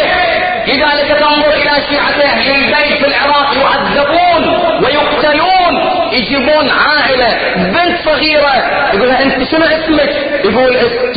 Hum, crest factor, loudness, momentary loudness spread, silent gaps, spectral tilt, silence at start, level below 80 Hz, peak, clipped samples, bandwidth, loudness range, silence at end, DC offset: none; 10 dB; -9 LUFS; 3 LU; none; -8.5 dB/octave; 0 s; -36 dBFS; 0 dBFS; under 0.1%; 5 kHz; 1 LU; 0 s; under 0.1%